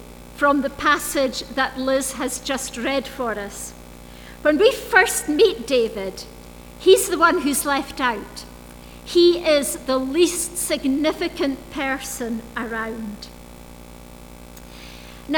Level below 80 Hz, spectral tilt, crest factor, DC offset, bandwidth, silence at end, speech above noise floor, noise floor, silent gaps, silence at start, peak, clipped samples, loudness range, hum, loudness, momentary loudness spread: -44 dBFS; -2.5 dB/octave; 22 dB; under 0.1%; over 20 kHz; 0 s; 20 dB; -41 dBFS; none; 0 s; 0 dBFS; under 0.1%; 9 LU; 60 Hz at -50 dBFS; -20 LUFS; 24 LU